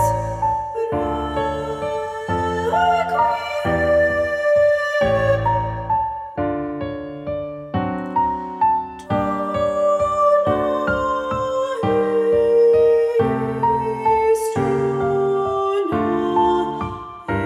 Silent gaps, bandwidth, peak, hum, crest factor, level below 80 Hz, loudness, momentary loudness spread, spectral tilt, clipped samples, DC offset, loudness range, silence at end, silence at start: none; 13.5 kHz; -6 dBFS; none; 12 dB; -42 dBFS; -20 LUFS; 9 LU; -6.5 dB/octave; under 0.1%; under 0.1%; 5 LU; 0 s; 0 s